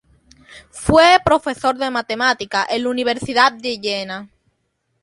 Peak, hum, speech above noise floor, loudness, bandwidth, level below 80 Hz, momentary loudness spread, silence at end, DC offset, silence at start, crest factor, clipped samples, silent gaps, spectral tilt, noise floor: 0 dBFS; none; 52 dB; -17 LUFS; 11.5 kHz; -42 dBFS; 13 LU; 0.75 s; under 0.1%; 0.5 s; 18 dB; under 0.1%; none; -4 dB/octave; -69 dBFS